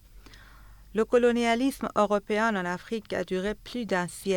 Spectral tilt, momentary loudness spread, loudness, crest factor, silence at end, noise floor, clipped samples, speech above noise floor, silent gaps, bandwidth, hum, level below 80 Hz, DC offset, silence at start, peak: -5 dB/octave; 10 LU; -27 LUFS; 18 dB; 0 s; -50 dBFS; under 0.1%; 23 dB; none; 18.5 kHz; none; -54 dBFS; under 0.1%; 0.15 s; -10 dBFS